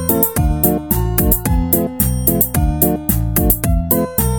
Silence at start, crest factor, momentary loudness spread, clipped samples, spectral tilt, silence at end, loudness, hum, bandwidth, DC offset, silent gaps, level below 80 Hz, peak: 0 s; 16 dB; 2 LU; under 0.1%; -6 dB/octave; 0 s; -15 LUFS; none; 18.5 kHz; 0.5%; none; -22 dBFS; 0 dBFS